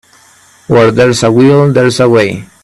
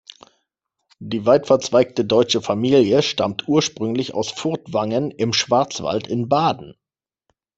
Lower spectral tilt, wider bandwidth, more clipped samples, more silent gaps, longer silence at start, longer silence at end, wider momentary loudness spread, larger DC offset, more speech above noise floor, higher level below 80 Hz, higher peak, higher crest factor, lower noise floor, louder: about the same, -6 dB/octave vs -5 dB/octave; first, 12.5 kHz vs 8.2 kHz; neither; neither; second, 0.7 s vs 1 s; second, 0.2 s vs 0.85 s; second, 4 LU vs 8 LU; neither; second, 36 dB vs 71 dB; first, -44 dBFS vs -60 dBFS; about the same, 0 dBFS vs -2 dBFS; second, 8 dB vs 18 dB; second, -43 dBFS vs -90 dBFS; first, -8 LUFS vs -19 LUFS